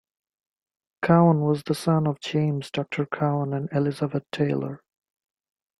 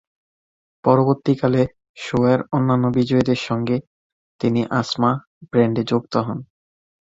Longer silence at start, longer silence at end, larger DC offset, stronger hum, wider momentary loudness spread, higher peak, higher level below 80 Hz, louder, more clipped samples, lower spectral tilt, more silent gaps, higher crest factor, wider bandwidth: first, 1 s vs 0.85 s; first, 1.05 s vs 0.6 s; neither; neither; first, 11 LU vs 7 LU; about the same, -4 dBFS vs -2 dBFS; second, -62 dBFS vs -54 dBFS; second, -24 LUFS vs -20 LUFS; neither; about the same, -7.5 dB/octave vs -7.5 dB/octave; second, none vs 1.89-1.94 s, 3.87-4.39 s, 5.27-5.41 s; about the same, 20 dB vs 18 dB; first, 12 kHz vs 7.8 kHz